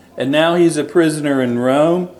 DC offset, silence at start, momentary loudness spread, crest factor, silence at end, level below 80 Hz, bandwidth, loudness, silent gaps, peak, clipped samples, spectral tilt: under 0.1%; 0.15 s; 4 LU; 14 dB; 0.05 s; -62 dBFS; 12.5 kHz; -15 LUFS; none; 0 dBFS; under 0.1%; -5.5 dB/octave